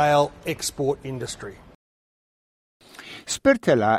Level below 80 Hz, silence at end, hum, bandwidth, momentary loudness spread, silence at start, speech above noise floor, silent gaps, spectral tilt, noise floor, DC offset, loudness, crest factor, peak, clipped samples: -54 dBFS; 0 s; none; 15.5 kHz; 20 LU; 0 s; over 68 dB; 1.75-2.80 s; -4.5 dB/octave; under -90 dBFS; under 0.1%; -23 LUFS; 20 dB; -4 dBFS; under 0.1%